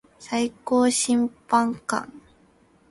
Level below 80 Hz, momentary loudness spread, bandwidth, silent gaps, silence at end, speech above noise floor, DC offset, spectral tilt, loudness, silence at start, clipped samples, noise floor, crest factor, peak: -62 dBFS; 10 LU; 11.5 kHz; none; 0.7 s; 35 dB; under 0.1%; -3 dB/octave; -23 LUFS; 0.2 s; under 0.1%; -58 dBFS; 18 dB; -8 dBFS